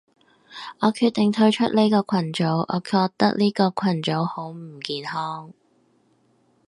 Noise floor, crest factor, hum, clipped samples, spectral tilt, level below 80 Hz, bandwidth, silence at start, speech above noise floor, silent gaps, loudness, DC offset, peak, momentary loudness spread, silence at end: -63 dBFS; 20 dB; none; under 0.1%; -6.5 dB/octave; -68 dBFS; 11.5 kHz; 0.5 s; 41 dB; none; -22 LUFS; under 0.1%; -2 dBFS; 15 LU; 1.15 s